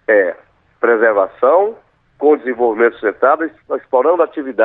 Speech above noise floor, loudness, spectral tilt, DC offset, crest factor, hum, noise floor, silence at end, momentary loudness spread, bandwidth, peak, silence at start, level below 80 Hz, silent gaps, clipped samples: 32 dB; -15 LUFS; -8 dB/octave; under 0.1%; 14 dB; none; -46 dBFS; 0 s; 8 LU; 3.9 kHz; 0 dBFS; 0.1 s; -64 dBFS; none; under 0.1%